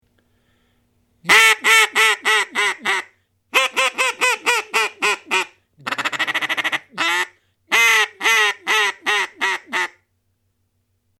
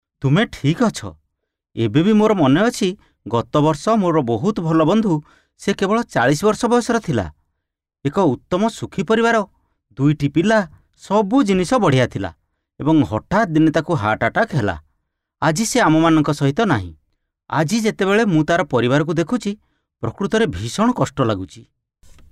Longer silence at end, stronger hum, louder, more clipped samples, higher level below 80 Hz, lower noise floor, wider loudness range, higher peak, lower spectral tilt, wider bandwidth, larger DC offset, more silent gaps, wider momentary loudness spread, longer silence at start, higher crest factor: first, 1.35 s vs 0.7 s; neither; about the same, -17 LUFS vs -18 LUFS; neither; second, -66 dBFS vs -46 dBFS; second, -68 dBFS vs -79 dBFS; about the same, 4 LU vs 2 LU; first, -2 dBFS vs -6 dBFS; second, 0.5 dB/octave vs -6 dB/octave; first, 17.5 kHz vs 14 kHz; neither; neither; about the same, 11 LU vs 10 LU; first, 1.25 s vs 0.2 s; first, 18 dB vs 12 dB